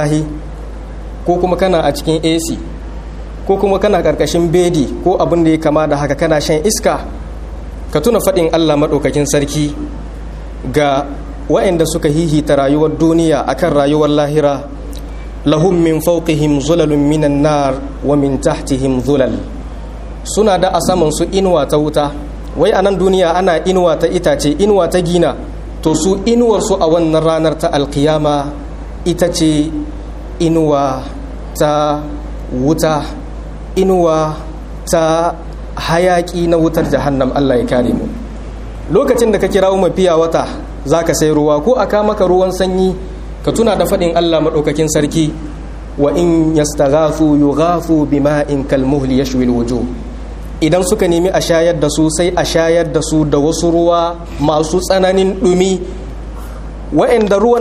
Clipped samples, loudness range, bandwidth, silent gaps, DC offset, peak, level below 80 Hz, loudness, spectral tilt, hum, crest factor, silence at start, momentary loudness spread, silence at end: under 0.1%; 3 LU; 15 kHz; none; under 0.1%; 0 dBFS; -26 dBFS; -13 LUFS; -5.5 dB/octave; none; 12 dB; 0 s; 15 LU; 0 s